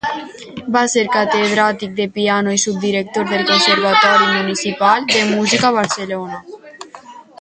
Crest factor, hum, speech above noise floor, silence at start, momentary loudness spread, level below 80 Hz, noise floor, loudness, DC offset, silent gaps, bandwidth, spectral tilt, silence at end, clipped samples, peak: 16 dB; none; 23 dB; 0.05 s; 18 LU; -58 dBFS; -38 dBFS; -15 LUFS; under 0.1%; none; 9.6 kHz; -3 dB/octave; 0.2 s; under 0.1%; 0 dBFS